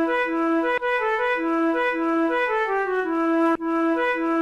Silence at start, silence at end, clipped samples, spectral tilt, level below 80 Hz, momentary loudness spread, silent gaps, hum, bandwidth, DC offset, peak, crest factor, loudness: 0 s; 0 s; under 0.1%; -4.5 dB/octave; -56 dBFS; 1 LU; none; none; 7.2 kHz; under 0.1%; -10 dBFS; 12 dB; -22 LUFS